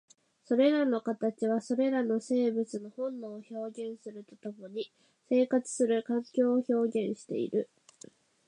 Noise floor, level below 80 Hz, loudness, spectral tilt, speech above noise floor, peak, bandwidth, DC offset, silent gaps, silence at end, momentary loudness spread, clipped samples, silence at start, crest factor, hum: -56 dBFS; -86 dBFS; -31 LUFS; -5.5 dB/octave; 26 dB; -14 dBFS; 10.5 kHz; under 0.1%; none; 0.85 s; 15 LU; under 0.1%; 0.5 s; 16 dB; none